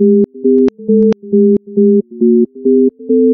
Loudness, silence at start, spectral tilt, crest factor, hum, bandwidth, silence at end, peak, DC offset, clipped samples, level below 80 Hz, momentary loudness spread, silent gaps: -11 LUFS; 0 s; -11.5 dB/octave; 10 dB; none; 4 kHz; 0 s; 0 dBFS; under 0.1%; under 0.1%; -54 dBFS; 1 LU; none